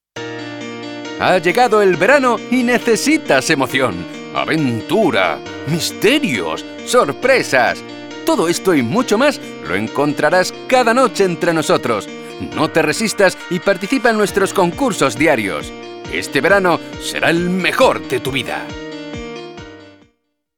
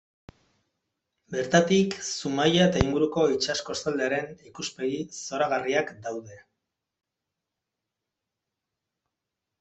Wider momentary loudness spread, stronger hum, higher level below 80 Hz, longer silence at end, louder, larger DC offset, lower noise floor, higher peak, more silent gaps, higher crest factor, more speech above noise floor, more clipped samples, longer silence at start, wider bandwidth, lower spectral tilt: about the same, 15 LU vs 14 LU; neither; about the same, -48 dBFS vs -50 dBFS; second, 0.65 s vs 3.2 s; first, -15 LUFS vs -26 LUFS; neither; second, -65 dBFS vs -86 dBFS; first, 0 dBFS vs -4 dBFS; neither; second, 16 dB vs 26 dB; second, 50 dB vs 60 dB; neither; second, 0.15 s vs 1.3 s; first, 19.5 kHz vs 8.4 kHz; about the same, -4 dB/octave vs -4.5 dB/octave